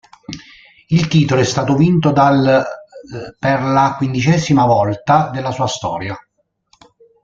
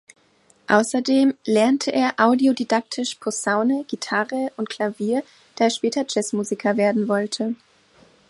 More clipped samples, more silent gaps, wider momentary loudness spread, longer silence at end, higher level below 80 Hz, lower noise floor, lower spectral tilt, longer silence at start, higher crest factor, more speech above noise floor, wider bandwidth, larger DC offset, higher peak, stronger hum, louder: neither; neither; first, 20 LU vs 8 LU; first, 1.05 s vs 0.75 s; first, -48 dBFS vs -70 dBFS; about the same, -59 dBFS vs -59 dBFS; first, -6.5 dB/octave vs -4 dB/octave; second, 0.3 s vs 0.7 s; second, 14 dB vs 20 dB; first, 45 dB vs 38 dB; second, 7.6 kHz vs 11.5 kHz; neither; about the same, -2 dBFS vs -2 dBFS; neither; first, -15 LUFS vs -21 LUFS